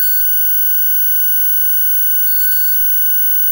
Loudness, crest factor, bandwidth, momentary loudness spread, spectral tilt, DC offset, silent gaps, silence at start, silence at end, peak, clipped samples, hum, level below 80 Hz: -9 LUFS; 8 dB; 16.5 kHz; 0 LU; 2.5 dB/octave; under 0.1%; none; 0 s; 0 s; -4 dBFS; under 0.1%; 50 Hz at -50 dBFS; -48 dBFS